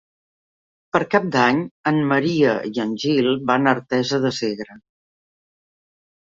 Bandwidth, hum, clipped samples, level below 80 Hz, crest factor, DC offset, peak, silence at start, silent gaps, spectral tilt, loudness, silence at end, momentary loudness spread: 7.6 kHz; none; under 0.1%; -62 dBFS; 20 dB; under 0.1%; -2 dBFS; 0.95 s; 1.71-1.84 s; -6 dB/octave; -20 LUFS; 1.55 s; 7 LU